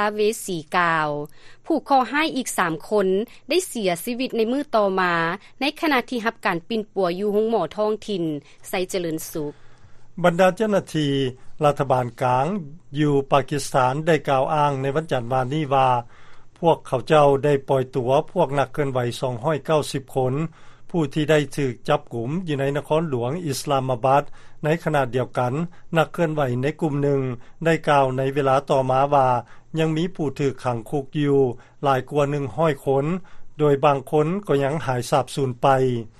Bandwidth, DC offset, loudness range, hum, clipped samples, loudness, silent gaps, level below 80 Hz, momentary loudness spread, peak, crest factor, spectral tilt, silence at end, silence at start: 13 kHz; under 0.1%; 3 LU; none; under 0.1%; -22 LUFS; none; -50 dBFS; 8 LU; -4 dBFS; 18 dB; -6 dB/octave; 0.1 s; 0 s